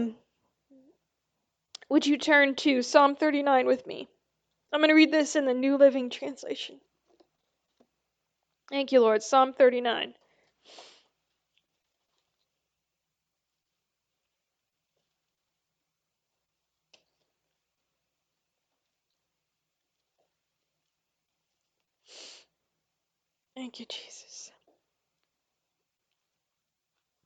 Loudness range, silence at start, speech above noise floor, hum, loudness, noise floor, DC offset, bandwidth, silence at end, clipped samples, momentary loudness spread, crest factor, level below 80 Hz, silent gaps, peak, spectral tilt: 22 LU; 0 s; 61 dB; none; -24 LUFS; -85 dBFS; under 0.1%; 9 kHz; 2.8 s; under 0.1%; 20 LU; 26 dB; -86 dBFS; none; -6 dBFS; -2.5 dB/octave